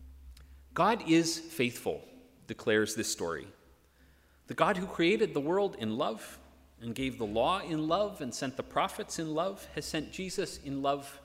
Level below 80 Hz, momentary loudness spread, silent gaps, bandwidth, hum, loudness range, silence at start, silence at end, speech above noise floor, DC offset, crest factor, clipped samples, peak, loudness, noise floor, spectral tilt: -58 dBFS; 13 LU; none; 16 kHz; none; 3 LU; 0 s; 0.05 s; 31 dB; under 0.1%; 22 dB; under 0.1%; -12 dBFS; -32 LUFS; -63 dBFS; -4 dB/octave